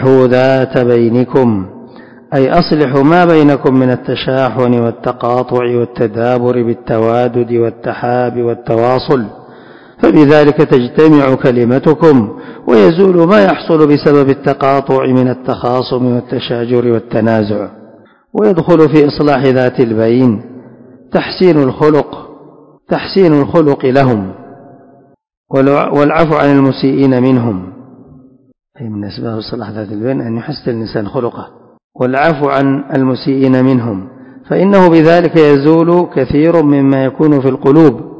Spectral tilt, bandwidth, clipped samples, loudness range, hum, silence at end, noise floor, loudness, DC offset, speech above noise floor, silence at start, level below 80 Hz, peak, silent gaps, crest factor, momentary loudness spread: -9 dB/octave; 8 kHz; 2%; 6 LU; none; 0 s; -45 dBFS; -10 LUFS; under 0.1%; 35 dB; 0 s; -44 dBFS; 0 dBFS; 25.37-25.44 s, 31.84-31.90 s; 10 dB; 11 LU